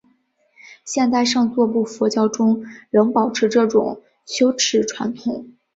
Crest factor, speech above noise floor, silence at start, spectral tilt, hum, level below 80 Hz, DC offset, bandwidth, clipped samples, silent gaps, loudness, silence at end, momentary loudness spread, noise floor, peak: 16 dB; 44 dB; 0.65 s; -4 dB/octave; none; -64 dBFS; under 0.1%; 8 kHz; under 0.1%; none; -19 LUFS; 0.25 s; 11 LU; -62 dBFS; -4 dBFS